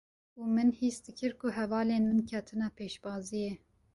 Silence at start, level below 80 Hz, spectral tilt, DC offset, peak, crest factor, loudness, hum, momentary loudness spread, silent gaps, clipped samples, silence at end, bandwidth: 0.35 s; -64 dBFS; -6 dB/octave; under 0.1%; -18 dBFS; 14 dB; -33 LUFS; none; 11 LU; none; under 0.1%; 0.4 s; 11.5 kHz